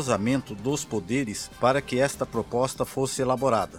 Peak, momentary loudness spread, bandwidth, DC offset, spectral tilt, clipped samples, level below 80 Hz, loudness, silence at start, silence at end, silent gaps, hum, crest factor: -8 dBFS; 5 LU; 17.5 kHz; under 0.1%; -5 dB/octave; under 0.1%; -52 dBFS; -26 LUFS; 0 s; 0 s; none; none; 18 dB